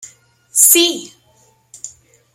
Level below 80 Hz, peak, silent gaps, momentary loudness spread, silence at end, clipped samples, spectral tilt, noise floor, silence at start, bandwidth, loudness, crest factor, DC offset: -68 dBFS; 0 dBFS; none; 25 LU; 0.45 s; under 0.1%; 1 dB/octave; -54 dBFS; 0.55 s; over 20 kHz; -10 LUFS; 18 dB; under 0.1%